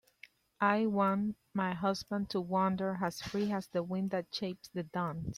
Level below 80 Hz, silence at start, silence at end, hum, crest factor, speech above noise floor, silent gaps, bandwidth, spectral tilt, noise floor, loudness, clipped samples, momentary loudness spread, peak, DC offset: -64 dBFS; 0.6 s; 0 s; none; 20 dB; 27 dB; none; 14 kHz; -6.5 dB/octave; -61 dBFS; -34 LUFS; under 0.1%; 8 LU; -14 dBFS; under 0.1%